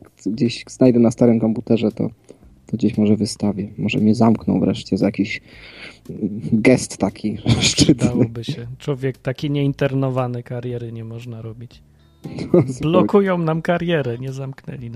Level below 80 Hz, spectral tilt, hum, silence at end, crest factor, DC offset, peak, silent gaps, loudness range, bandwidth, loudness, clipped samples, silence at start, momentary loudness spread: -46 dBFS; -6 dB/octave; none; 0 s; 18 dB; under 0.1%; 0 dBFS; none; 5 LU; 12 kHz; -19 LUFS; under 0.1%; 0.25 s; 16 LU